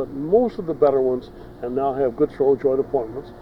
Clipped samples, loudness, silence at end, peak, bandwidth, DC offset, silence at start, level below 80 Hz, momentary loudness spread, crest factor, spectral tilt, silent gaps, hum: under 0.1%; -21 LUFS; 0 s; -4 dBFS; 5.6 kHz; under 0.1%; 0 s; -48 dBFS; 10 LU; 16 dB; -9.5 dB/octave; none; none